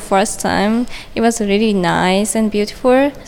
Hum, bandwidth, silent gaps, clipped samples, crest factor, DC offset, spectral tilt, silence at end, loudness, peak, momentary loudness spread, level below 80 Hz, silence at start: none; 17 kHz; none; under 0.1%; 14 dB; under 0.1%; -4.5 dB/octave; 0 s; -15 LUFS; 0 dBFS; 4 LU; -38 dBFS; 0 s